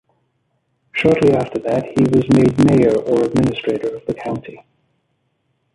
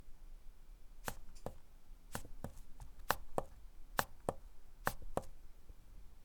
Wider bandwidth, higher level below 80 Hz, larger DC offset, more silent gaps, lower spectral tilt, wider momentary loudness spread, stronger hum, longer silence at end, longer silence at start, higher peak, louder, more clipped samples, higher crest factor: second, 11.5 kHz vs 19.5 kHz; first, -46 dBFS vs -52 dBFS; neither; neither; first, -7.5 dB/octave vs -3.5 dB/octave; second, 12 LU vs 23 LU; neither; first, 1.2 s vs 0 s; first, 0.95 s vs 0 s; first, 0 dBFS vs -12 dBFS; first, -16 LUFS vs -45 LUFS; neither; second, 16 dB vs 32 dB